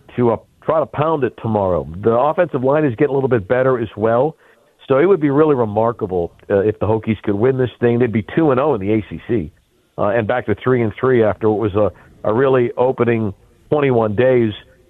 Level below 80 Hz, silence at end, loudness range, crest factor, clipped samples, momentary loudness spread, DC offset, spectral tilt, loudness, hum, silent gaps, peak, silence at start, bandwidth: -48 dBFS; 0.3 s; 2 LU; 14 dB; under 0.1%; 7 LU; under 0.1%; -10 dB/octave; -17 LUFS; none; none; -2 dBFS; 0.15 s; 4.1 kHz